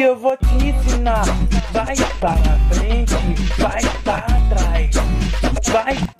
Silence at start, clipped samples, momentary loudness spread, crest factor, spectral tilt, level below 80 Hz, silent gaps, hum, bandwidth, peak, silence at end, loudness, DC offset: 0 s; under 0.1%; 3 LU; 10 dB; -5.5 dB/octave; -18 dBFS; none; none; 12.5 kHz; -4 dBFS; 0 s; -18 LUFS; 2%